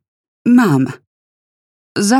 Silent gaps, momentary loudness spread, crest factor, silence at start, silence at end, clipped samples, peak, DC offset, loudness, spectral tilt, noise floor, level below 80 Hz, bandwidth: 1.07-1.95 s; 11 LU; 14 dB; 0.45 s; 0 s; under 0.1%; -2 dBFS; under 0.1%; -14 LUFS; -5.5 dB/octave; under -90 dBFS; -68 dBFS; 14 kHz